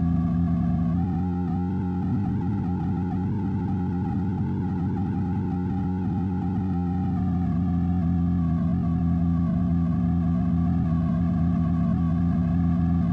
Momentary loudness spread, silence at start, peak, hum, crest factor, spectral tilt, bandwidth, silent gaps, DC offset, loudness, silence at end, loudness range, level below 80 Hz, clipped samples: 3 LU; 0 s; -12 dBFS; none; 10 dB; -11 dB/octave; 3.8 kHz; none; under 0.1%; -25 LUFS; 0 s; 3 LU; -40 dBFS; under 0.1%